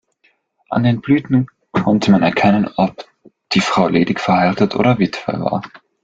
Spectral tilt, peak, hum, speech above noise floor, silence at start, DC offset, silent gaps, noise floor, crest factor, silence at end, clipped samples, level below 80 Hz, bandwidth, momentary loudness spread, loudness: -6.5 dB/octave; 0 dBFS; none; 45 dB; 0.7 s; under 0.1%; none; -60 dBFS; 16 dB; 0.25 s; under 0.1%; -50 dBFS; 7.8 kHz; 8 LU; -16 LUFS